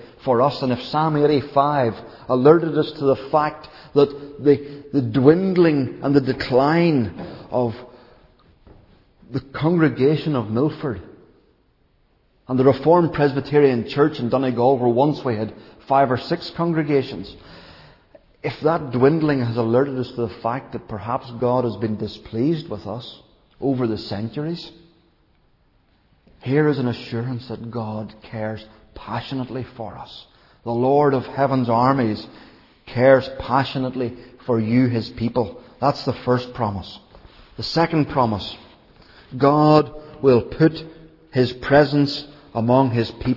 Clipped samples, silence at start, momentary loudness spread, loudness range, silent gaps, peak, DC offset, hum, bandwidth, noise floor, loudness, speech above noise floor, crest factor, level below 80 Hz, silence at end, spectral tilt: under 0.1%; 0 s; 15 LU; 8 LU; none; 0 dBFS; under 0.1%; none; 6 kHz; -61 dBFS; -20 LUFS; 41 dB; 20 dB; -50 dBFS; 0 s; -8.5 dB/octave